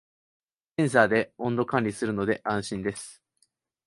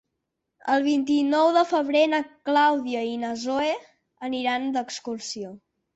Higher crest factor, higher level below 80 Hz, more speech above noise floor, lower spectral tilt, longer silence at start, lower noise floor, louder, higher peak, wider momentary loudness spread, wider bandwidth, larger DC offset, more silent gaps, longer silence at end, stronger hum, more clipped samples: first, 24 dB vs 16 dB; first, -60 dBFS vs -70 dBFS; second, 45 dB vs 57 dB; first, -5.5 dB/octave vs -3.5 dB/octave; first, 0.8 s vs 0.65 s; second, -71 dBFS vs -81 dBFS; about the same, -26 LUFS vs -24 LUFS; first, -4 dBFS vs -10 dBFS; about the same, 13 LU vs 13 LU; first, 11.5 kHz vs 8.2 kHz; neither; neither; first, 0.75 s vs 0.4 s; neither; neither